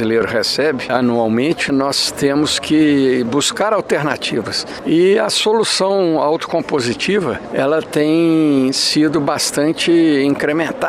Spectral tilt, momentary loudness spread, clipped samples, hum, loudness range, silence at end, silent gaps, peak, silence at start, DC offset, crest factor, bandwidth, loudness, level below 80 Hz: -4 dB/octave; 5 LU; under 0.1%; none; 1 LU; 0 s; none; 0 dBFS; 0 s; under 0.1%; 14 dB; 15 kHz; -15 LUFS; -52 dBFS